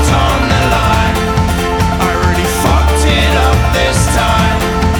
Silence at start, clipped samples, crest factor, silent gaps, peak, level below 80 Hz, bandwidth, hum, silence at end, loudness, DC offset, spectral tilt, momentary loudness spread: 0 s; under 0.1%; 10 dB; none; 0 dBFS; -16 dBFS; 20 kHz; none; 0 s; -11 LUFS; under 0.1%; -5 dB/octave; 3 LU